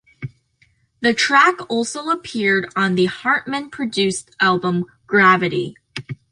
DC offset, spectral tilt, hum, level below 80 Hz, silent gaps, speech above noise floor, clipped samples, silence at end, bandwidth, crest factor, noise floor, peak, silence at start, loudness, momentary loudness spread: under 0.1%; -4.5 dB/octave; none; -60 dBFS; none; 42 dB; under 0.1%; 0.15 s; 11 kHz; 18 dB; -60 dBFS; -2 dBFS; 0.2 s; -18 LUFS; 17 LU